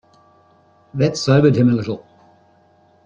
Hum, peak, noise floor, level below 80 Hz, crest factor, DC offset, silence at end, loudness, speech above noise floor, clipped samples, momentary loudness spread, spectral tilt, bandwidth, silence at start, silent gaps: none; -2 dBFS; -54 dBFS; -54 dBFS; 16 dB; under 0.1%; 1.1 s; -16 LUFS; 39 dB; under 0.1%; 17 LU; -7 dB/octave; 8.4 kHz; 0.95 s; none